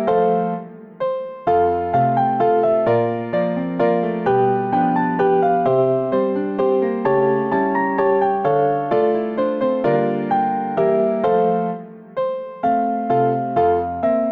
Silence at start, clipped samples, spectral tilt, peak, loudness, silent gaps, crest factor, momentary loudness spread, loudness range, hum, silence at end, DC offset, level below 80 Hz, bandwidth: 0 s; under 0.1%; -10 dB/octave; -8 dBFS; -19 LUFS; none; 10 dB; 7 LU; 2 LU; none; 0 s; under 0.1%; -54 dBFS; 4.9 kHz